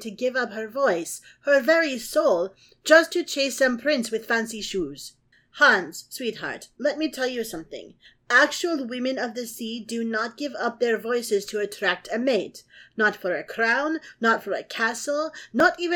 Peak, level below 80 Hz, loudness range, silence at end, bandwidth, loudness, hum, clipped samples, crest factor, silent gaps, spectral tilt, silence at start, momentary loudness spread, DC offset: -2 dBFS; -64 dBFS; 4 LU; 0 s; 19 kHz; -24 LUFS; none; under 0.1%; 22 dB; none; -2.5 dB/octave; 0 s; 14 LU; under 0.1%